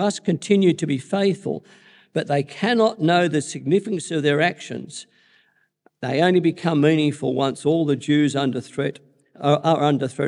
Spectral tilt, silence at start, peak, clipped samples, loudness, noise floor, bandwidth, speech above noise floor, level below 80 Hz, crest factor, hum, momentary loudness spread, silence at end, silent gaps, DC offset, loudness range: -6 dB/octave; 0 s; -4 dBFS; under 0.1%; -21 LUFS; -63 dBFS; 11 kHz; 42 dB; -72 dBFS; 16 dB; none; 11 LU; 0 s; none; under 0.1%; 2 LU